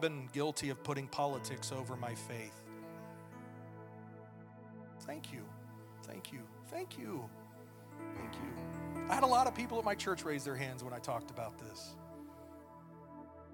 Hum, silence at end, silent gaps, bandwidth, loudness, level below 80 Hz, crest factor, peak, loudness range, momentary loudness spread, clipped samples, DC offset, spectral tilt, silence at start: none; 0 s; none; 18 kHz; -40 LUFS; -72 dBFS; 24 dB; -16 dBFS; 14 LU; 18 LU; under 0.1%; under 0.1%; -4.5 dB/octave; 0 s